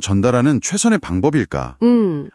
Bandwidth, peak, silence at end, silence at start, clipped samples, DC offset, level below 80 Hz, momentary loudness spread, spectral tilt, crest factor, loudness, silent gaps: 12 kHz; -2 dBFS; 0.05 s; 0 s; under 0.1%; under 0.1%; -44 dBFS; 4 LU; -5.5 dB/octave; 16 dB; -16 LUFS; none